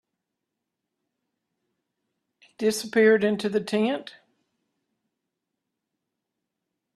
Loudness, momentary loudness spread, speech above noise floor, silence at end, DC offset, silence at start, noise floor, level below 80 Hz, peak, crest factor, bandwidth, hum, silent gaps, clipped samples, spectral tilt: -23 LUFS; 8 LU; 61 dB; 2.85 s; under 0.1%; 2.6 s; -84 dBFS; -76 dBFS; -8 dBFS; 22 dB; 13 kHz; none; none; under 0.1%; -4.5 dB/octave